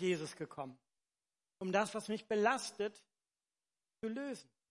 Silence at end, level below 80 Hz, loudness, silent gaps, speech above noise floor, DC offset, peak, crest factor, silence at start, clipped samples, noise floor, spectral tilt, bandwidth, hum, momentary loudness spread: 0.3 s; -86 dBFS; -39 LUFS; none; over 52 dB; under 0.1%; -18 dBFS; 22 dB; 0 s; under 0.1%; under -90 dBFS; -4.5 dB/octave; 11.5 kHz; none; 13 LU